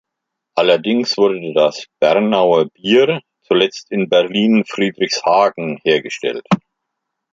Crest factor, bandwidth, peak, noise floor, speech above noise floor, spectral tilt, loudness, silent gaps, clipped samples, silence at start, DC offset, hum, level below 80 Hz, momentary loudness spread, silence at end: 16 dB; 7.6 kHz; 0 dBFS; -79 dBFS; 64 dB; -5 dB/octave; -16 LUFS; none; under 0.1%; 0.55 s; under 0.1%; none; -62 dBFS; 7 LU; 0.75 s